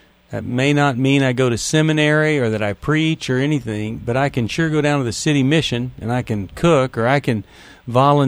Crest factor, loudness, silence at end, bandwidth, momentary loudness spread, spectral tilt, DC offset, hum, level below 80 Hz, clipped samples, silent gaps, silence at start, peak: 16 dB; -18 LUFS; 0 s; 13.5 kHz; 9 LU; -5.5 dB/octave; under 0.1%; none; -44 dBFS; under 0.1%; none; 0.3 s; -2 dBFS